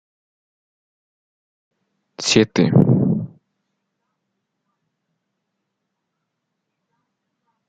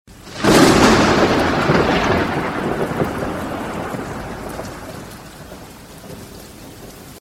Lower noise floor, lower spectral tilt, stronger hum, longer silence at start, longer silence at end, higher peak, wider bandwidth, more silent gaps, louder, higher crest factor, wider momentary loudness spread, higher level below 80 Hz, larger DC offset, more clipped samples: first, -77 dBFS vs -37 dBFS; about the same, -6 dB/octave vs -5 dB/octave; neither; first, 2.2 s vs 0.1 s; first, 4.4 s vs 0 s; about the same, 0 dBFS vs 0 dBFS; second, 7.6 kHz vs 16.5 kHz; neither; about the same, -17 LUFS vs -16 LUFS; first, 24 dB vs 18 dB; second, 10 LU vs 25 LU; second, -58 dBFS vs -36 dBFS; neither; neither